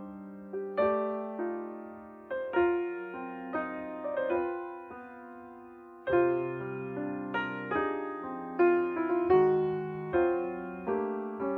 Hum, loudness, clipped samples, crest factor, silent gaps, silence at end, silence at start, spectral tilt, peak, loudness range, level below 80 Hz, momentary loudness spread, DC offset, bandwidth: none; -31 LUFS; under 0.1%; 18 dB; none; 0 s; 0 s; -9.5 dB/octave; -14 dBFS; 5 LU; -64 dBFS; 19 LU; under 0.1%; 4.4 kHz